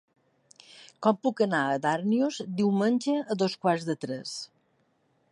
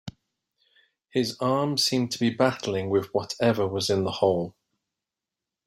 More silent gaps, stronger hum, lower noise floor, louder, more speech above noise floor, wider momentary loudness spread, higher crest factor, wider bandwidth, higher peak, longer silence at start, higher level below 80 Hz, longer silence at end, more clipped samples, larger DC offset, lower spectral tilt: neither; neither; second, -70 dBFS vs -88 dBFS; about the same, -27 LUFS vs -25 LUFS; second, 43 dB vs 63 dB; about the same, 9 LU vs 7 LU; about the same, 18 dB vs 20 dB; second, 11.5 kHz vs 16 kHz; second, -10 dBFS vs -6 dBFS; first, 0.75 s vs 0.05 s; second, -78 dBFS vs -64 dBFS; second, 0.85 s vs 1.15 s; neither; neither; about the same, -5.5 dB/octave vs -5 dB/octave